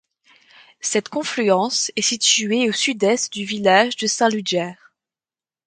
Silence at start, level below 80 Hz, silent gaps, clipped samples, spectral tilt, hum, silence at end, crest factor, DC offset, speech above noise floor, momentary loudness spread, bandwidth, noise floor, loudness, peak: 0.85 s; -68 dBFS; none; under 0.1%; -2 dB/octave; none; 0.95 s; 20 dB; under 0.1%; over 71 dB; 8 LU; 9.6 kHz; under -90 dBFS; -19 LUFS; -2 dBFS